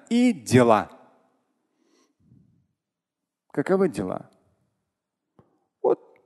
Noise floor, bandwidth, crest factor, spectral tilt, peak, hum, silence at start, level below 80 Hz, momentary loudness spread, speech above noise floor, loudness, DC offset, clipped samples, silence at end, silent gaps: -86 dBFS; 12.5 kHz; 24 dB; -6.5 dB/octave; -2 dBFS; none; 0.1 s; -62 dBFS; 15 LU; 65 dB; -23 LUFS; under 0.1%; under 0.1%; 0.3 s; none